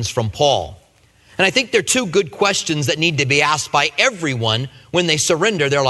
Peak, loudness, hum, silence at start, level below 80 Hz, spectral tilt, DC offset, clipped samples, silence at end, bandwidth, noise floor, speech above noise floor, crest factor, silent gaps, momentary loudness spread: 0 dBFS; -17 LUFS; none; 0 s; -50 dBFS; -3 dB/octave; under 0.1%; under 0.1%; 0 s; 12.5 kHz; -53 dBFS; 35 dB; 18 dB; none; 7 LU